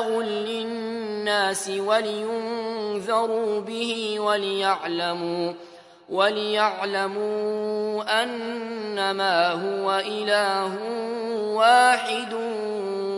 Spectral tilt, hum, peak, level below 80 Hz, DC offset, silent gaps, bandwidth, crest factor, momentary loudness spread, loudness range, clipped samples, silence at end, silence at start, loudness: -3 dB/octave; none; -4 dBFS; -78 dBFS; under 0.1%; none; 11.5 kHz; 20 dB; 8 LU; 3 LU; under 0.1%; 0 s; 0 s; -24 LUFS